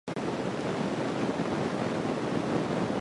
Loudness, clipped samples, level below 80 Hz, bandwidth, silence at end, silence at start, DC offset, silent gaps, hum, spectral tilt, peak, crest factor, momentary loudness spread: -31 LUFS; under 0.1%; -58 dBFS; 11.5 kHz; 0 s; 0.05 s; under 0.1%; none; none; -6 dB/octave; -16 dBFS; 14 dB; 2 LU